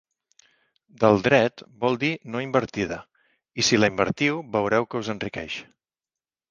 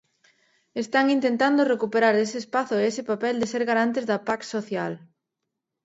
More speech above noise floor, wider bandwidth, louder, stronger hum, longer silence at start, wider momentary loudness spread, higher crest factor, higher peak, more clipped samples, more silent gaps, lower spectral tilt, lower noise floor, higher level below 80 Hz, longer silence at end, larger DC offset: first, over 67 dB vs 59 dB; first, 10 kHz vs 8 kHz; about the same, -23 LUFS vs -24 LUFS; neither; first, 1 s vs 0.75 s; first, 12 LU vs 9 LU; about the same, 22 dB vs 18 dB; first, -2 dBFS vs -6 dBFS; neither; neither; about the same, -4.5 dB/octave vs -4.5 dB/octave; first, under -90 dBFS vs -83 dBFS; first, -56 dBFS vs -72 dBFS; about the same, 0.85 s vs 0.85 s; neither